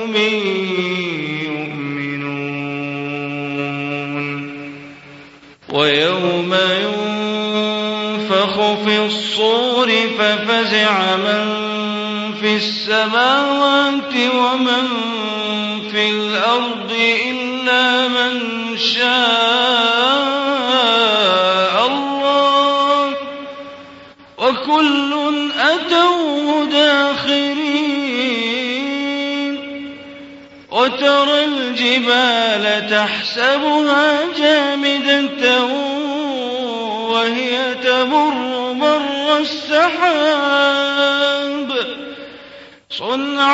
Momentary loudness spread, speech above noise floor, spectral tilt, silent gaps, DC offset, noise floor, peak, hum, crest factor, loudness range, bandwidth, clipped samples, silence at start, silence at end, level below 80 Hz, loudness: 10 LU; 26 dB; -4 dB/octave; none; under 0.1%; -42 dBFS; 0 dBFS; none; 16 dB; 6 LU; 8 kHz; under 0.1%; 0 s; 0 s; -64 dBFS; -16 LUFS